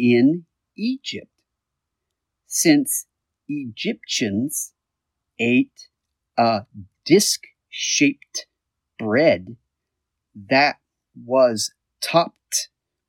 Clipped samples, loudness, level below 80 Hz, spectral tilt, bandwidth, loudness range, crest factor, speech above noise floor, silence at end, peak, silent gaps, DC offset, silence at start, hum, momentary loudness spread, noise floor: under 0.1%; -21 LUFS; -72 dBFS; -3.5 dB/octave; 17 kHz; 3 LU; 20 dB; 62 dB; 0.45 s; -2 dBFS; none; under 0.1%; 0 s; none; 15 LU; -81 dBFS